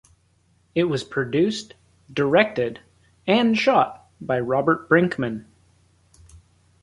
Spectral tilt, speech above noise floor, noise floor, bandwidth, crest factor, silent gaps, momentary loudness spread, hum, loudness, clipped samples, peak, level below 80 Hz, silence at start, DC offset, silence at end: -6 dB/octave; 42 dB; -62 dBFS; 11.5 kHz; 20 dB; none; 12 LU; none; -22 LUFS; under 0.1%; -4 dBFS; -58 dBFS; 0.75 s; under 0.1%; 1.4 s